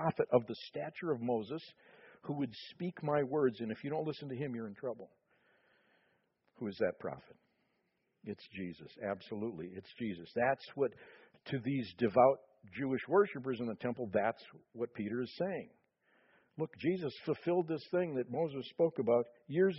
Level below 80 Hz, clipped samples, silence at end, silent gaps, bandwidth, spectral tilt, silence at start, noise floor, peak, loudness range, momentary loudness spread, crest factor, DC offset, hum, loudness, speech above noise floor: -76 dBFS; under 0.1%; 0 s; none; 5.8 kHz; -5.5 dB/octave; 0 s; -81 dBFS; -16 dBFS; 10 LU; 14 LU; 22 dB; under 0.1%; none; -37 LUFS; 44 dB